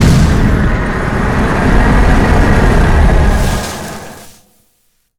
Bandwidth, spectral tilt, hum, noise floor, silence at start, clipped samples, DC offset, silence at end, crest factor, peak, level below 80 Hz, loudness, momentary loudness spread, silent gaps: 16 kHz; -6.5 dB/octave; none; -58 dBFS; 0 s; under 0.1%; under 0.1%; 0.9 s; 10 dB; 0 dBFS; -14 dBFS; -11 LUFS; 11 LU; none